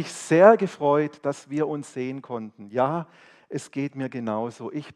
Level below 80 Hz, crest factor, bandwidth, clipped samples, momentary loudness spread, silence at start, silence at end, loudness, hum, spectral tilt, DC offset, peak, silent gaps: -72 dBFS; 24 dB; 12 kHz; under 0.1%; 19 LU; 0 s; 0.05 s; -24 LUFS; none; -6.5 dB/octave; under 0.1%; 0 dBFS; none